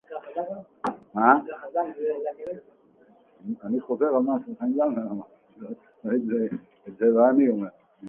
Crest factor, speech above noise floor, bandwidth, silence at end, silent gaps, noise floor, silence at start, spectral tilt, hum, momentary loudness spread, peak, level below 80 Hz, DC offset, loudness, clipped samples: 24 dB; 33 dB; 4.7 kHz; 0 s; none; -58 dBFS; 0.1 s; -9.5 dB/octave; none; 18 LU; -2 dBFS; -72 dBFS; under 0.1%; -25 LUFS; under 0.1%